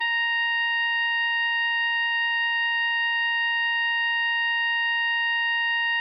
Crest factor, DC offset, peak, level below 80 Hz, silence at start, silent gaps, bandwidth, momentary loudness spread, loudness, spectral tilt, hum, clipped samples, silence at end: 4 dB; under 0.1%; -20 dBFS; under -90 dBFS; 0 s; none; 6 kHz; 0 LU; -22 LUFS; 5 dB/octave; none; under 0.1%; 0 s